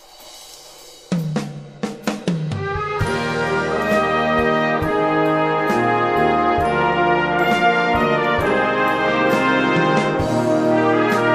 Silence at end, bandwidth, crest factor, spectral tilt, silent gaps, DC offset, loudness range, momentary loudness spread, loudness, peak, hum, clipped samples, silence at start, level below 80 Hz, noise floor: 0 s; 15.5 kHz; 16 dB; -6 dB/octave; none; under 0.1%; 6 LU; 9 LU; -18 LUFS; -4 dBFS; none; under 0.1%; 0.2 s; -42 dBFS; -42 dBFS